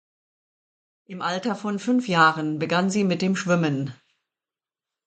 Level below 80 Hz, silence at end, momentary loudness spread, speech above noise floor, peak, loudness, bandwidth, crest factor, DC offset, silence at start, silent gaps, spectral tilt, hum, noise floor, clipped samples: -70 dBFS; 1.15 s; 11 LU; over 67 dB; -4 dBFS; -23 LUFS; 9.2 kHz; 22 dB; under 0.1%; 1.1 s; none; -5.5 dB/octave; none; under -90 dBFS; under 0.1%